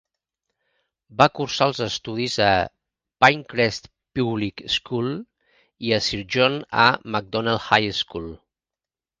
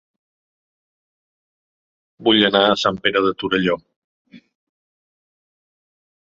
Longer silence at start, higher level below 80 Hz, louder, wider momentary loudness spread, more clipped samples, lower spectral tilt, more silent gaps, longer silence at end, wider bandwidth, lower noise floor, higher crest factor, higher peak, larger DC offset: second, 1.1 s vs 2.2 s; first, -52 dBFS vs -58 dBFS; second, -21 LUFS vs -17 LUFS; first, 13 LU vs 8 LU; neither; about the same, -4.5 dB/octave vs -5 dB/octave; second, none vs 3.96-4.25 s; second, 0.85 s vs 1.9 s; first, 10 kHz vs 7.8 kHz; about the same, under -90 dBFS vs under -90 dBFS; about the same, 24 dB vs 22 dB; about the same, 0 dBFS vs -2 dBFS; neither